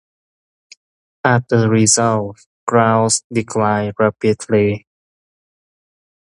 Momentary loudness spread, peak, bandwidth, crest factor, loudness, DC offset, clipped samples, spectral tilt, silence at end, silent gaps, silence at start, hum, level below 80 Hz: 9 LU; 0 dBFS; 11.5 kHz; 18 dB; -16 LUFS; under 0.1%; under 0.1%; -4.5 dB/octave; 1.45 s; 2.46-2.67 s, 3.24-3.30 s; 1.25 s; none; -52 dBFS